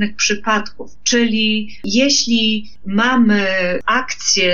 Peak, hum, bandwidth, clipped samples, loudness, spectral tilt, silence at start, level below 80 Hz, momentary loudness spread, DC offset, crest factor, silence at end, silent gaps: -4 dBFS; none; 7.4 kHz; under 0.1%; -16 LUFS; -2.5 dB/octave; 0 s; -48 dBFS; 8 LU; 4%; 14 dB; 0 s; none